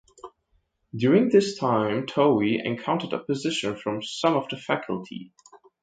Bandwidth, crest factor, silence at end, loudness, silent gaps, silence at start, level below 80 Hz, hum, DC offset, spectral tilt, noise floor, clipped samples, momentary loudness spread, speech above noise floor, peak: 9.2 kHz; 20 dB; 0.25 s; -24 LUFS; none; 0.25 s; -66 dBFS; none; under 0.1%; -5.5 dB/octave; -70 dBFS; under 0.1%; 11 LU; 46 dB; -6 dBFS